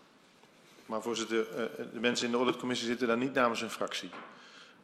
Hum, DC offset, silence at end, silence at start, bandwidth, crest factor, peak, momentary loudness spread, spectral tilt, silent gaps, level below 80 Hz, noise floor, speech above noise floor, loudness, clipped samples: none; under 0.1%; 0.1 s; 0.8 s; 14.5 kHz; 20 dB; -14 dBFS; 17 LU; -3.5 dB/octave; none; -76 dBFS; -61 dBFS; 28 dB; -33 LUFS; under 0.1%